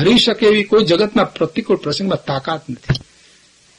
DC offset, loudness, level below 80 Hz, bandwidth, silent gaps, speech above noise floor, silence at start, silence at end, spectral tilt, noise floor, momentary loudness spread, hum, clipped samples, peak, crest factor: under 0.1%; -16 LUFS; -44 dBFS; 11.5 kHz; none; 35 dB; 0 s; 0.8 s; -5.5 dB/octave; -50 dBFS; 10 LU; none; under 0.1%; -2 dBFS; 14 dB